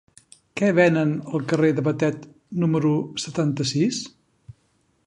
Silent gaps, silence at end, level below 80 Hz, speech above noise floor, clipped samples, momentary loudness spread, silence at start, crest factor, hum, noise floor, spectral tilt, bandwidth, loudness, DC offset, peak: none; 0.55 s; -60 dBFS; 45 dB; under 0.1%; 14 LU; 0.55 s; 20 dB; none; -66 dBFS; -6 dB/octave; 11 kHz; -22 LUFS; under 0.1%; -4 dBFS